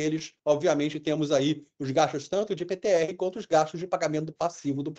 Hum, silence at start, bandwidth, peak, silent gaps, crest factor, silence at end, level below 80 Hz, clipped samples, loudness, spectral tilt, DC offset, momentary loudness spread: none; 0 s; 8.4 kHz; -8 dBFS; none; 18 dB; 0.05 s; -68 dBFS; under 0.1%; -27 LUFS; -5.5 dB/octave; under 0.1%; 6 LU